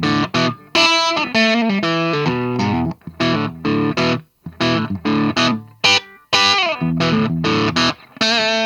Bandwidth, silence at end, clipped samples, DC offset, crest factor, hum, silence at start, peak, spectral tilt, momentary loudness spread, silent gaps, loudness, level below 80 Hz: 14 kHz; 0 s; under 0.1%; under 0.1%; 18 dB; none; 0 s; 0 dBFS; -4 dB/octave; 7 LU; none; -17 LUFS; -48 dBFS